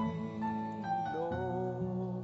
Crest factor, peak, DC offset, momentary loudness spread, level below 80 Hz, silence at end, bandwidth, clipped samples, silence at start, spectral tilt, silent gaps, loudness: 12 dB; -24 dBFS; under 0.1%; 2 LU; -62 dBFS; 0 s; 7.6 kHz; under 0.1%; 0 s; -7.5 dB/octave; none; -37 LUFS